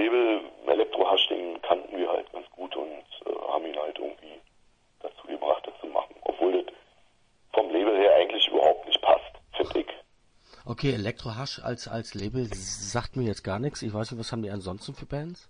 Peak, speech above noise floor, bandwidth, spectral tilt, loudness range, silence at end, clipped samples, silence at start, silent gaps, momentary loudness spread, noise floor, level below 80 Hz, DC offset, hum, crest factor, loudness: -6 dBFS; 31 dB; 10.5 kHz; -4.5 dB/octave; 9 LU; 0.1 s; under 0.1%; 0 s; none; 17 LU; -63 dBFS; -54 dBFS; under 0.1%; none; 22 dB; -27 LUFS